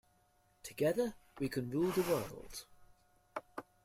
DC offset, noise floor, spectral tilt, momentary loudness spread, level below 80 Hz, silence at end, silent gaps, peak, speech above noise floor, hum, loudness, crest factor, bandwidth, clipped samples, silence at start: under 0.1%; -72 dBFS; -5.5 dB/octave; 16 LU; -64 dBFS; 0.25 s; none; -22 dBFS; 36 dB; none; -37 LUFS; 18 dB; 16 kHz; under 0.1%; 0.65 s